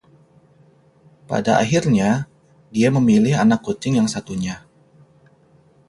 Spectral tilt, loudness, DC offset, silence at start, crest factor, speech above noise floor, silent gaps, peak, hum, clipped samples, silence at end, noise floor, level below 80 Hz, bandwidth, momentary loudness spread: -6 dB/octave; -18 LUFS; under 0.1%; 1.3 s; 18 dB; 37 dB; none; -4 dBFS; none; under 0.1%; 1.3 s; -54 dBFS; -52 dBFS; 11.5 kHz; 12 LU